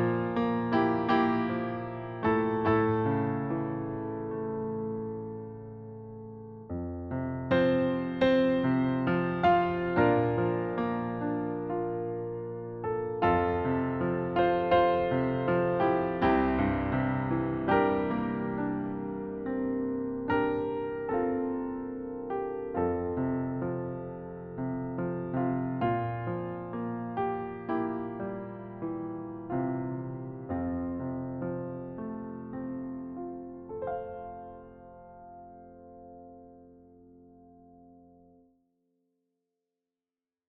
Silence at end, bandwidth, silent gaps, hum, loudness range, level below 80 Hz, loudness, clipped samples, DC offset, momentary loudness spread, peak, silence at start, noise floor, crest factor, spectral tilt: 2.6 s; 5.8 kHz; none; none; 11 LU; -54 dBFS; -31 LUFS; under 0.1%; under 0.1%; 15 LU; -12 dBFS; 0 s; under -90 dBFS; 18 dB; -6.5 dB/octave